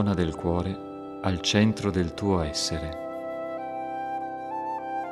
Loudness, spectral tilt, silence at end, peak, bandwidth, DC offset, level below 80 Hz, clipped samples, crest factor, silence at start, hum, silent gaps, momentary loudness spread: -28 LUFS; -5 dB/octave; 0 s; -8 dBFS; 13 kHz; under 0.1%; -46 dBFS; under 0.1%; 20 dB; 0 s; none; none; 11 LU